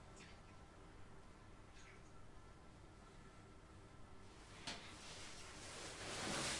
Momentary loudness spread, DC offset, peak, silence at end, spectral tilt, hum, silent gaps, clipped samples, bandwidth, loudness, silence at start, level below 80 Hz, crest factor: 14 LU; under 0.1%; -32 dBFS; 0 s; -2.5 dB/octave; none; none; under 0.1%; 11.5 kHz; -54 LUFS; 0 s; -66 dBFS; 22 dB